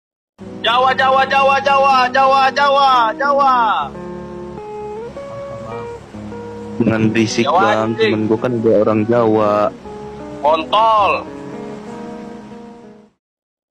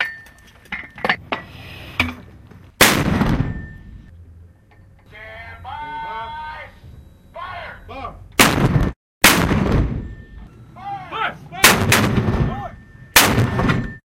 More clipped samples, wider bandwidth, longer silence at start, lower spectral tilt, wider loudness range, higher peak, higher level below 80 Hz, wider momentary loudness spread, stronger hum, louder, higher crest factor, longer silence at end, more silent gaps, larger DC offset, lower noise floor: neither; second, 11 kHz vs 16 kHz; first, 0.4 s vs 0 s; first, -5 dB/octave vs -3.5 dB/octave; second, 8 LU vs 16 LU; second, -4 dBFS vs 0 dBFS; second, -50 dBFS vs -32 dBFS; second, 18 LU vs 23 LU; neither; first, -14 LUFS vs -17 LUFS; second, 12 dB vs 20 dB; first, 0.8 s vs 0.2 s; second, none vs 8.96-9.21 s; neither; second, -40 dBFS vs -48 dBFS